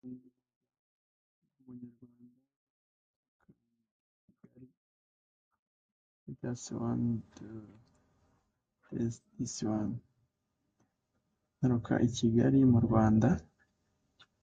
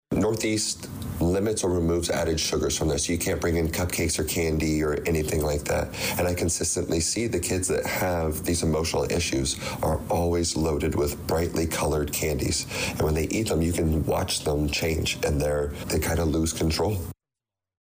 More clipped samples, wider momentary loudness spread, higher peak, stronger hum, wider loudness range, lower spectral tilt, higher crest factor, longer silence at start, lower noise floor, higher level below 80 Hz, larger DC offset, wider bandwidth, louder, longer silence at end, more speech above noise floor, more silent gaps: neither; first, 25 LU vs 3 LU; about the same, -14 dBFS vs -16 dBFS; neither; first, 11 LU vs 1 LU; first, -7 dB/octave vs -4.5 dB/octave; first, 22 dB vs 10 dB; about the same, 0.05 s vs 0.1 s; second, -83 dBFS vs -89 dBFS; second, -58 dBFS vs -38 dBFS; neither; second, 9 kHz vs 16 kHz; second, -31 LUFS vs -25 LUFS; first, 1 s vs 0.7 s; second, 53 dB vs 64 dB; first, 0.56-0.61 s, 0.79-1.42 s, 2.56-3.40 s, 3.91-4.28 s, 4.77-5.51 s, 5.59-6.26 s vs none